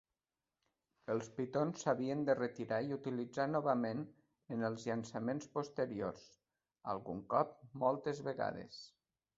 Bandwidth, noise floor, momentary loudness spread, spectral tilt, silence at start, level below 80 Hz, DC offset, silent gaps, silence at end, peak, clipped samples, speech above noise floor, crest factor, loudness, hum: 7.6 kHz; under -90 dBFS; 11 LU; -6 dB/octave; 1.1 s; -76 dBFS; under 0.1%; none; 0.5 s; -18 dBFS; under 0.1%; over 51 dB; 22 dB; -39 LUFS; none